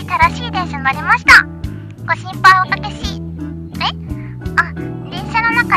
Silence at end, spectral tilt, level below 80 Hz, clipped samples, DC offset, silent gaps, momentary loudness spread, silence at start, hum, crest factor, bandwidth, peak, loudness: 0 s; -4 dB/octave; -34 dBFS; 0.3%; under 0.1%; none; 19 LU; 0 s; none; 16 dB; 15 kHz; 0 dBFS; -13 LUFS